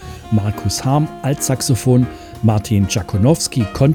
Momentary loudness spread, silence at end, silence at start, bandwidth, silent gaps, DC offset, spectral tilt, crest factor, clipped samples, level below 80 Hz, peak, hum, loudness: 5 LU; 0 s; 0 s; 19 kHz; none; under 0.1%; -6 dB/octave; 14 dB; under 0.1%; -40 dBFS; -2 dBFS; none; -17 LUFS